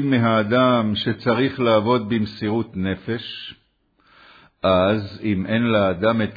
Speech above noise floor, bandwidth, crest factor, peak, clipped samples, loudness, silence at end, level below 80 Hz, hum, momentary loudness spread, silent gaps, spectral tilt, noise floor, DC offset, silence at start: 42 dB; 5 kHz; 16 dB; -4 dBFS; under 0.1%; -20 LUFS; 0 s; -54 dBFS; none; 9 LU; none; -9 dB/octave; -62 dBFS; under 0.1%; 0 s